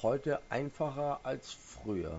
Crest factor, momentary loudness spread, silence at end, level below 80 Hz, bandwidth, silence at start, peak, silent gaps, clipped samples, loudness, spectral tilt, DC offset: 16 dB; 9 LU; 0 s; -58 dBFS; 7.6 kHz; 0 s; -20 dBFS; none; under 0.1%; -37 LUFS; -5.5 dB/octave; under 0.1%